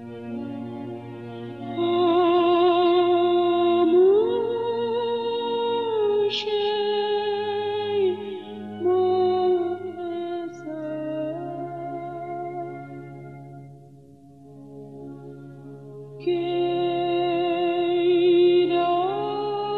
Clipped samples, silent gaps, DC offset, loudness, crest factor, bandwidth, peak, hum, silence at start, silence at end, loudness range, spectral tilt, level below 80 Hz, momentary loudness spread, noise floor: under 0.1%; none; under 0.1%; -23 LUFS; 14 dB; 5.8 kHz; -10 dBFS; none; 0 s; 0 s; 16 LU; -7 dB/octave; -68 dBFS; 21 LU; -48 dBFS